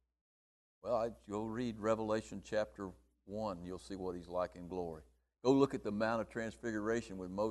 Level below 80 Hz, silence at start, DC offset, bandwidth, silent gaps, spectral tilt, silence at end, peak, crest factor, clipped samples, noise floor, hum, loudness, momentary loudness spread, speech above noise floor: -62 dBFS; 0.85 s; under 0.1%; 12 kHz; none; -6 dB/octave; 0 s; -16 dBFS; 22 dB; under 0.1%; under -90 dBFS; none; -39 LUFS; 13 LU; over 52 dB